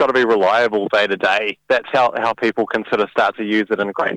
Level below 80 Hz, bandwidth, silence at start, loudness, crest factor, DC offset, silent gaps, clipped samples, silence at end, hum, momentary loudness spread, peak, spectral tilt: -62 dBFS; 10.5 kHz; 0 s; -17 LUFS; 14 dB; under 0.1%; none; under 0.1%; 0 s; none; 5 LU; -2 dBFS; -5 dB/octave